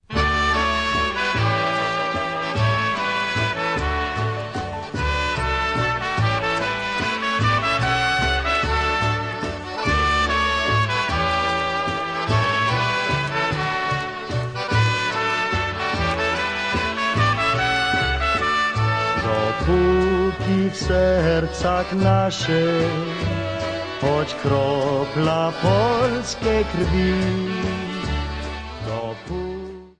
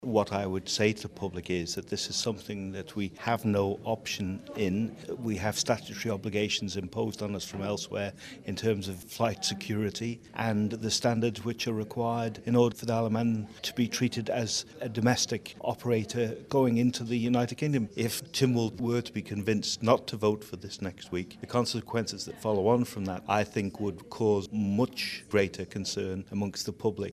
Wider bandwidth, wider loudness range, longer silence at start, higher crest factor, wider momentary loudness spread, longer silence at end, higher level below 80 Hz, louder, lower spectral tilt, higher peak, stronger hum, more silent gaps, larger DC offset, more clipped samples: second, 10.5 kHz vs 15.5 kHz; about the same, 3 LU vs 3 LU; about the same, 0.1 s vs 0 s; second, 16 dB vs 22 dB; about the same, 7 LU vs 9 LU; about the same, 0.1 s vs 0 s; first, -34 dBFS vs -62 dBFS; first, -21 LUFS vs -31 LUFS; about the same, -5.5 dB/octave vs -5 dB/octave; about the same, -6 dBFS vs -8 dBFS; neither; neither; neither; neither